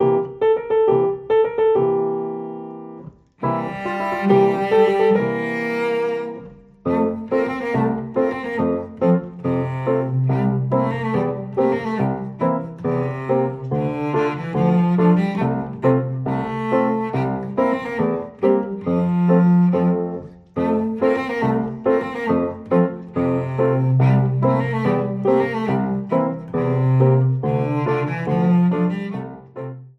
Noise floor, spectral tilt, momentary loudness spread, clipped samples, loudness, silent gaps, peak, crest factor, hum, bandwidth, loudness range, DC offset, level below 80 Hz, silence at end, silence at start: -40 dBFS; -9.5 dB/octave; 8 LU; under 0.1%; -20 LUFS; none; -2 dBFS; 16 dB; none; 6 kHz; 3 LU; under 0.1%; -54 dBFS; 0.1 s; 0 s